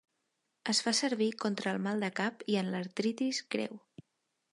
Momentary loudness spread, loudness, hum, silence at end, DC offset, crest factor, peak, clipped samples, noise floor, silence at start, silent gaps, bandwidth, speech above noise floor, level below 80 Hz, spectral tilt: 8 LU; -33 LUFS; none; 0.75 s; under 0.1%; 18 dB; -16 dBFS; under 0.1%; -82 dBFS; 0.65 s; none; 11.5 kHz; 49 dB; -84 dBFS; -3.5 dB/octave